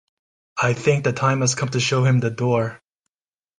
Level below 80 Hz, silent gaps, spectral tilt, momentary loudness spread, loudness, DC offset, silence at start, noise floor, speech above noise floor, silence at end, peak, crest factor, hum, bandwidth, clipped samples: -58 dBFS; none; -5 dB/octave; 5 LU; -20 LUFS; under 0.1%; 0.55 s; under -90 dBFS; over 70 dB; 0.85 s; -4 dBFS; 16 dB; none; 10 kHz; under 0.1%